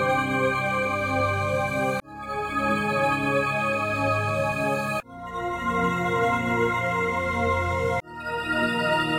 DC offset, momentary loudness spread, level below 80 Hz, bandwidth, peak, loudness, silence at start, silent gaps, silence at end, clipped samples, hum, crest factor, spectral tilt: under 0.1%; 7 LU; -48 dBFS; 16 kHz; -12 dBFS; -25 LUFS; 0 s; none; 0 s; under 0.1%; none; 14 dB; -5.5 dB/octave